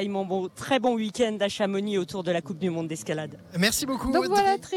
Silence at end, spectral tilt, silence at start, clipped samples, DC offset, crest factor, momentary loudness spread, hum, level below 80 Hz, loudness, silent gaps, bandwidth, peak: 0 s; -4.5 dB/octave; 0 s; under 0.1%; under 0.1%; 18 dB; 8 LU; none; -52 dBFS; -26 LUFS; none; 18 kHz; -8 dBFS